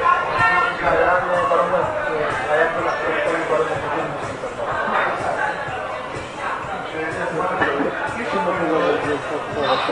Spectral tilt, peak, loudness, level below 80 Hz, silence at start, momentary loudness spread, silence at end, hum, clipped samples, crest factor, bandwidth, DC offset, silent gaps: -5 dB/octave; -4 dBFS; -21 LUFS; -48 dBFS; 0 s; 9 LU; 0 s; none; under 0.1%; 16 dB; 11.5 kHz; under 0.1%; none